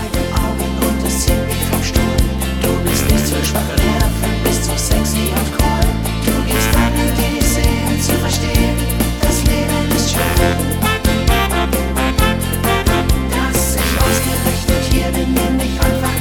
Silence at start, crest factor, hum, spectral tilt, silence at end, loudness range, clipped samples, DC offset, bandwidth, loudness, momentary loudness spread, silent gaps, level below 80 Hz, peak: 0 s; 14 dB; none; -4.5 dB/octave; 0 s; 1 LU; under 0.1%; 0.8%; 19 kHz; -16 LUFS; 3 LU; none; -20 dBFS; 0 dBFS